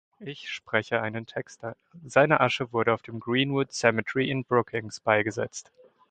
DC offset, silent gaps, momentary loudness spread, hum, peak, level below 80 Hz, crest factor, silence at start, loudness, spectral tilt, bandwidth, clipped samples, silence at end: under 0.1%; none; 15 LU; none; -4 dBFS; -64 dBFS; 22 dB; 0.2 s; -26 LUFS; -5 dB/octave; 9.2 kHz; under 0.1%; 0.5 s